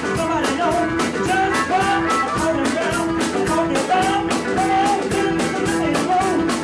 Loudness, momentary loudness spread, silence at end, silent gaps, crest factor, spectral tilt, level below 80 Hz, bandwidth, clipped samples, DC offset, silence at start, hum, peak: -19 LUFS; 3 LU; 0 s; none; 10 dB; -4.5 dB/octave; -42 dBFS; 11 kHz; under 0.1%; under 0.1%; 0 s; none; -10 dBFS